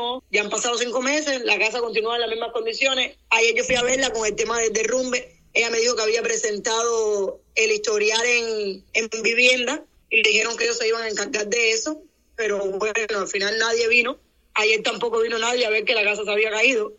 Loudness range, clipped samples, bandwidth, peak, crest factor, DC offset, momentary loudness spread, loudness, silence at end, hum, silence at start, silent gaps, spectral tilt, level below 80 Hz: 2 LU; under 0.1%; 8.6 kHz; -2 dBFS; 20 dB; under 0.1%; 8 LU; -21 LUFS; 0.05 s; none; 0 s; none; -0.5 dB/octave; -58 dBFS